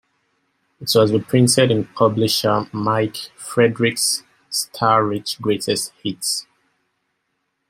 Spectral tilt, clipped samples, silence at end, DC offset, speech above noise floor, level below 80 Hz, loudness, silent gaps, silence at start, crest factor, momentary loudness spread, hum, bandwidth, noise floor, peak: -4 dB/octave; under 0.1%; 1.3 s; under 0.1%; 54 dB; -60 dBFS; -19 LUFS; none; 0.8 s; 18 dB; 9 LU; none; 16.5 kHz; -73 dBFS; -2 dBFS